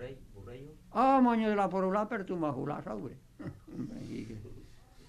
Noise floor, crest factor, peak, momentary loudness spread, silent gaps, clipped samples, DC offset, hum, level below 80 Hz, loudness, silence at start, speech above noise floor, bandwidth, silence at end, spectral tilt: -54 dBFS; 18 dB; -14 dBFS; 22 LU; none; under 0.1%; under 0.1%; none; -58 dBFS; -31 LUFS; 0 s; 23 dB; 11 kHz; 0.05 s; -7.5 dB/octave